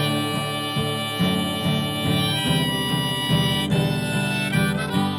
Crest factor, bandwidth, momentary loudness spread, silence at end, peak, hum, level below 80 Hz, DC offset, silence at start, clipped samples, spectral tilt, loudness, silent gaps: 14 dB; 17.5 kHz; 4 LU; 0 s; -8 dBFS; none; -46 dBFS; under 0.1%; 0 s; under 0.1%; -5 dB/octave; -22 LUFS; none